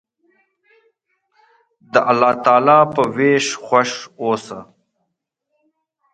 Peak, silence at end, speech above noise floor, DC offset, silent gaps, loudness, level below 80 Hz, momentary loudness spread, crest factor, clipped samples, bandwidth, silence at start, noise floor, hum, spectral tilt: 0 dBFS; 1.5 s; 60 dB; under 0.1%; none; -16 LUFS; -64 dBFS; 12 LU; 18 dB; under 0.1%; 9.4 kHz; 1.95 s; -76 dBFS; none; -4.5 dB/octave